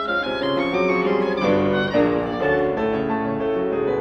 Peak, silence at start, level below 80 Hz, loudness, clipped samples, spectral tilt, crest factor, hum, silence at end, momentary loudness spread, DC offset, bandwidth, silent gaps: -8 dBFS; 0 s; -46 dBFS; -21 LUFS; under 0.1%; -7 dB/octave; 14 dB; none; 0 s; 4 LU; under 0.1%; 7 kHz; none